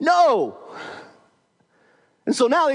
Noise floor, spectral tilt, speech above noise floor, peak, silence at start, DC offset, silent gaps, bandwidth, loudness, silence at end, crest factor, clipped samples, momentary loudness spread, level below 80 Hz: -63 dBFS; -3.5 dB/octave; 45 dB; -6 dBFS; 0 s; under 0.1%; none; 11 kHz; -20 LUFS; 0 s; 16 dB; under 0.1%; 21 LU; -80 dBFS